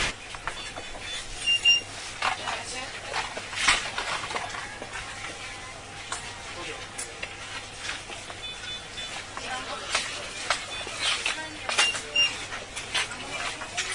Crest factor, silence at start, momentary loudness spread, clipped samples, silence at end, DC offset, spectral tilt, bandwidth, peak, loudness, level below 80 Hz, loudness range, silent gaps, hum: 26 dB; 0 s; 13 LU; under 0.1%; 0 s; under 0.1%; -0.5 dB/octave; 11.5 kHz; -6 dBFS; -28 LUFS; -52 dBFS; 10 LU; none; none